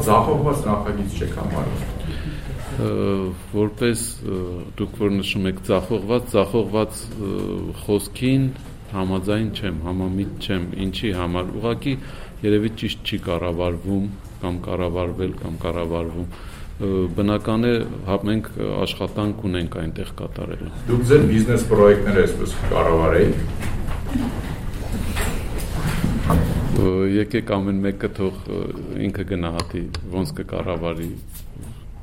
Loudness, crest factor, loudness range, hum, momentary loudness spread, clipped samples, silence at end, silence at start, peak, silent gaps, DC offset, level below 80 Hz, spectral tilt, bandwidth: -22 LUFS; 20 dB; 7 LU; none; 12 LU; under 0.1%; 0 s; 0 s; 0 dBFS; none; under 0.1%; -32 dBFS; -6.5 dB/octave; 16 kHz